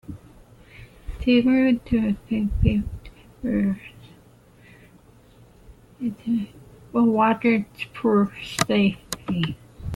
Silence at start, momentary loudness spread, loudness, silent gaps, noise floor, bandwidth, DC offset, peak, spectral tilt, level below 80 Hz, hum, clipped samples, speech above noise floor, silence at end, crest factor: 0.1 s; 18 LU; -23 LUFS; none; -52 dBFS; 14 kHz; under 0.1%; -2 dBFS; -6 dB/octave; -38 dBFS; none; under 0.1%; 31 dB; 0 s; 22 dB